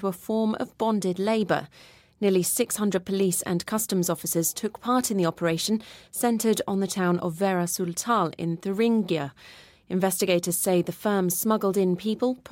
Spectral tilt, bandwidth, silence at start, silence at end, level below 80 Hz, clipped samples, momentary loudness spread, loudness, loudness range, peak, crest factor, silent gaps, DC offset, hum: -4.5 dB/octave; 17 kHz; 0 s; 0.15 s; -64 dBFS; under 0.1%; 5 LU; -25 LUFS; 1 LU; -10 dBFS; 16 dB; none; under 0.1%; none